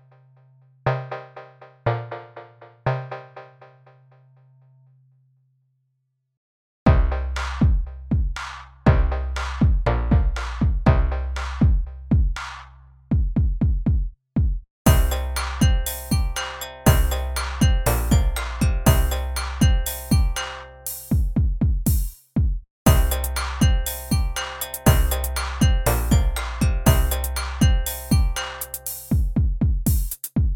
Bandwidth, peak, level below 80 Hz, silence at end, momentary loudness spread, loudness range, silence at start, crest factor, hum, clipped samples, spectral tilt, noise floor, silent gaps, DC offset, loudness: 20 kHz; 0 dBFS; -24 dBFS; 0 s; 10 LU; 9 LU; 0.85 s; 20 dB; none; under 0.1%; -5.5 dB/octave; -73 dBFS; 6.37-6.86 s, 14.70-14.85 s, 22.70-22.85 s; under 0.1%; -23 LUFS